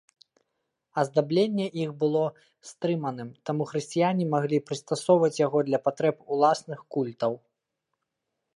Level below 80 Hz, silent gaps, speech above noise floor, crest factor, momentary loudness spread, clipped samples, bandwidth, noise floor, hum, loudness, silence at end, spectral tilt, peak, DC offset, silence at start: -78 dBFS; none; 57 dB; 18 dB; 9 LU; under 0.1%; 11.5 kHz; -83 dBFS; none; -27 LUFS; 1.2 s; -6.5 dB/octave; -8 dBFS; under 0.1%; 0.95 s